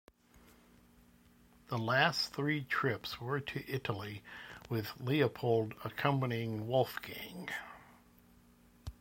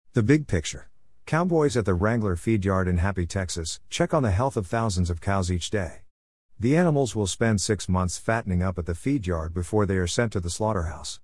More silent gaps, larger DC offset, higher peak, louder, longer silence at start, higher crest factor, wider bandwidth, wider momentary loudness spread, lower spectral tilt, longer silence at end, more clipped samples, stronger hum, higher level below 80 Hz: second, none vs 6.11-6.49 s; second, under 0.1% vs 0.3%; second, -14 dBFS vs -6 dBFS; second, -35 LUFS vs -25 LUFS; first, 1.7 s vs 0.15 s; first, 24 dB vs 18 dB; first, 16.5 kHz vs 12 kHz; first, 15 LU vs 7 LU; about the same, -5.5 dB/octave vs -5.5 dB/octave; about the same, 0.1 s vs 0.05 s; neither; neither; second, -64 dBFS vs -46 dBFS